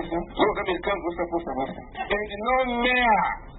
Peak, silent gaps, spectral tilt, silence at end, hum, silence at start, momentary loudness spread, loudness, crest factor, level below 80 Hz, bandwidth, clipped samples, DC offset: -8 dBFS; none; -9 dB/octave; 0 s; none; 0 s; 10 LU; -25 LUFS; 18 dB; -44 dBFS; 4.1 kHz; under 0.1%; under 0.1%